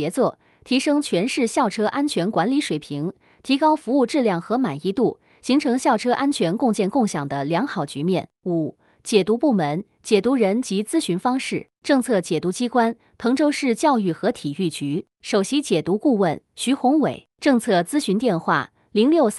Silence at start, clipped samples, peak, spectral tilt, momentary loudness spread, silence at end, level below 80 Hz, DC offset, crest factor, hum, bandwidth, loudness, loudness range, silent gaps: 0 s; under 0.1%; -4 dBFS; -5 dB/octave; 7 LU; 0 s; -64 dBFS; under 0.1%; 16 dB; none; 13 kHz; -21 LUFS; 2 LU; none